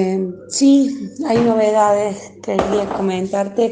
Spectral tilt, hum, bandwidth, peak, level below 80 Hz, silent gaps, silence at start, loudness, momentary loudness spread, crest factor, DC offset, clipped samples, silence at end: -5.5 dB/octave; none; 9.6 kHz; 0 dBFS; -48 dBFS; none; 0 s; -17 LUFS; 10 LU; 16 dB; under 0.1%; under 0.1%; 0 s